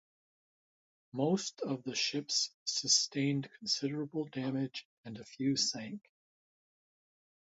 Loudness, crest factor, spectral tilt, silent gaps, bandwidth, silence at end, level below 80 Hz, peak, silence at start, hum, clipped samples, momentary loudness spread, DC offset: -34 LUFS; 22 dB; -3 dB/octave; 2.54-2.66 s, 4.85-5.04 s; 8 kHz; 1.5 s; -82 dBFS; -14 dBFS; 1.15 s; none; under 0.1%; 18 LU; under 0.1%